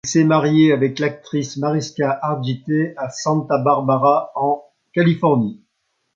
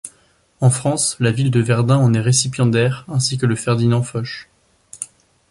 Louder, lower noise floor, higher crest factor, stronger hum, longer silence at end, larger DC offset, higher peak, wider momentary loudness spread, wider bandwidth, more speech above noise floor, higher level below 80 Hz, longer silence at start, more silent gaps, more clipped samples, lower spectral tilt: about the same, -18 LUFS vs -17 LUFS; first, -71 dBFS vs -56 dBFS; about the same, 16 dB vs 16 dB; neither; first, 0.6 s vs 0.45 s; neither; about the same, -2 dBFS vs -2 dBFS; second, 10 LU vs 17 LU; second, 7.6 kHz vs 11.5 kHz; first, 53 dB vs 40 dB; second, -62 dBFS vs -52 dBFS; about the same, 0.05 s vs 0.05 s; neither; neither; first, -6.5 dB/octave vs -5 dB/octave